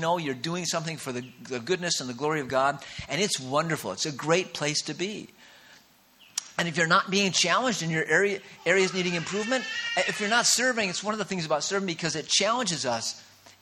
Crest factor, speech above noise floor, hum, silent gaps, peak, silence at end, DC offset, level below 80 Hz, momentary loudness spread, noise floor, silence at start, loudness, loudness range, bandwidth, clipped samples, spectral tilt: 20 dB; 30 dB; none; none; -8 dBFS; 0.1 s; under 0.1%; -66 dBFS; 11 LU; -58 dBFS; 0 s; -26 LUFS; 4 LU; 17 kHz; under 0.1%; -2.5 dB/octave